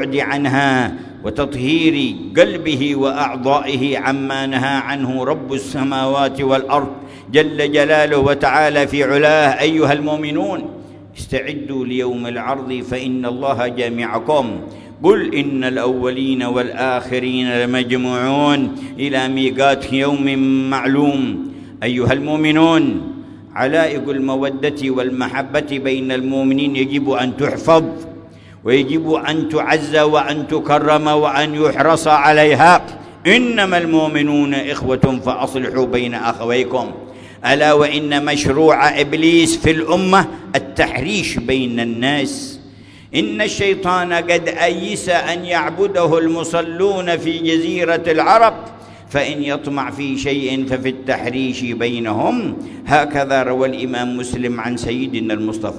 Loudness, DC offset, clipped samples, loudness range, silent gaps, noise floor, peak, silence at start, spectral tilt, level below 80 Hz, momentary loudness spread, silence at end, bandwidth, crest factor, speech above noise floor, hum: -16 LUFS; under 0.1%; under 0.1%; 6 LU; none; -40 dBFS; 0 dBFS; 0 s; -5 dB/octave; -46 dBFS; 10 LU; 0 s; 11 kHz; 16 dB; 24 dB; none